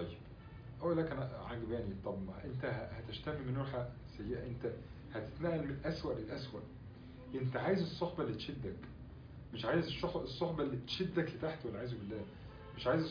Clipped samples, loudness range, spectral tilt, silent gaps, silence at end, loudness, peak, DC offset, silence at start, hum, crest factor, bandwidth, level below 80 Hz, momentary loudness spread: under 0.1%; 3 LU; -5.5 dB/octave; none; 0 s; -41 LUFS; -22 dBFS; under 0.1%; 0 s; none; 18 dB; 5.4 kHz; -58 dBFS; 16 LU